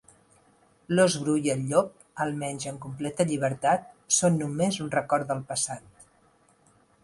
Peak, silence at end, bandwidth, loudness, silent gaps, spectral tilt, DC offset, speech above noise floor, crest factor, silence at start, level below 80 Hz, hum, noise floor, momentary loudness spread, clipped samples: -8 dBFS; 1 s; 11.5 kHz; -27 LUFS; none; -4.5 dB/octave; under 0.1%; 36 dB; 20 dB; 0.9 s; -64 dBFS; none; -63 dBFS; 11 LU; under 0.1%